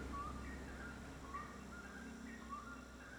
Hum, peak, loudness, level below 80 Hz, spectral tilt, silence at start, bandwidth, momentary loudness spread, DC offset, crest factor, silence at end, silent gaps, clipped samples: none; -36 dBFS; -51 LUFS; -56 dBFS; -5 dB/octave; 0 s; over 20 kHz; 5 LU; under 0.1%; 14 dB; 0 s; none; under 0.1%